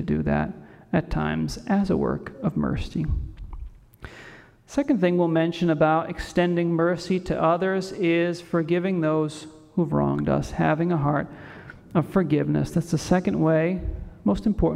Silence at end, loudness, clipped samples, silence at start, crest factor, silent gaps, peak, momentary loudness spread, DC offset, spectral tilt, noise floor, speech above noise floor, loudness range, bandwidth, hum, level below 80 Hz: 0 s; -24 LUFS; under 0.1%; 0 s; 16 dB; none; -8 dBFS; 14 LU; under 0.1%; -7.5 dB/octave; -47 dBFS; 24 dB; 4 LU; 12.5 kHz; none; -40 dBFS